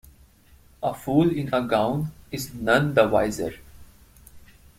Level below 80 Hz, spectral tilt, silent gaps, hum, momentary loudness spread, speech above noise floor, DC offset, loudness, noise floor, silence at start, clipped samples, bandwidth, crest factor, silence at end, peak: -50 dBFS; -6 dB/octave; none; none; 12 LU; 32 dB; under 0.1%; -24 LUFS; -54 dBFS; 0.8 s; under 0.1%; 16.5 kHz; 22 dB; 0.4 s; -4 dBFS